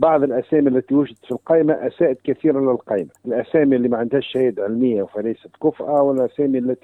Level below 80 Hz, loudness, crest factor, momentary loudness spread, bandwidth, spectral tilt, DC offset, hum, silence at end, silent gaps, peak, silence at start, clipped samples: -60 dBFS; -19 LUFS; 18 dB; 8 LU; 4.1 kHz; -9 dB/octave; under 0.1%; none; 0.1 s; none; -2 dBFS; 0 s; under 0.1%